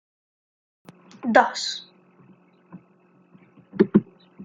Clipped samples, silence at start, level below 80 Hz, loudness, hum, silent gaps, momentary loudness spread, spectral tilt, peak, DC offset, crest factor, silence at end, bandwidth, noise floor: under 0.1%; 1.25 s; -64 dBFS; -22 LUFS; none; none; 15 LU; -5 dB/octave; -2 dBFS; under 0.1%; 24 dB; 0 s; 9.4 kHz; -58 dBFS